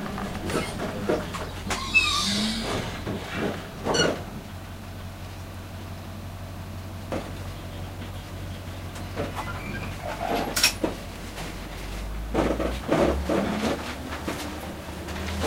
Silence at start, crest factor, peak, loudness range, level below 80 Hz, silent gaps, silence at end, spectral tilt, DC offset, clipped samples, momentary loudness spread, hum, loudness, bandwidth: 0 s; 24 dB; -6 dBFS; 11 LU; -40 dBFS; none; 0 s; -4 dB/octave; under 0.1%; under 0.1%; 16 LU; none; -29 LUFS; 16 kHz